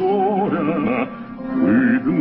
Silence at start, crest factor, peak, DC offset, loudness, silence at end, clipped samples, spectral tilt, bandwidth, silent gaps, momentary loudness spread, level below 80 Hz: 0 s; 12 dB; -6 dBFS; under 0.1%; -19 LUFS; 0 s; under 0.1%; -12.5 dB/octave; 4.7 kHz; none; 10 LU; -52 dBFS